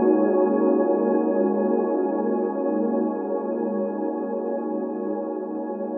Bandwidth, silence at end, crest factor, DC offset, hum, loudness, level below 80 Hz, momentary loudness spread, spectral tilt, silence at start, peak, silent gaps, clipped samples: 2.7 kHz; 0 s; 16 dB; under 0.1%; none; -24 LUFS; under -90 dBFS; 8 LU; -14 dB/octave; 0 s; -6 dBFS; none; under 0.1%